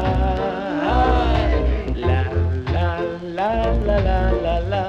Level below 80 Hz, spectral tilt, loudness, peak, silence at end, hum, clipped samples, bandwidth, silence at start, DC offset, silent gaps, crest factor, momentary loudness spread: -24 dBFS; -8 dB/octave; -20 LUFS; -6 dBFS; 0 s; none; under 0.1%; 6.8 kHz; 0 s; under 0.1%; none; 14 dB; 5 LU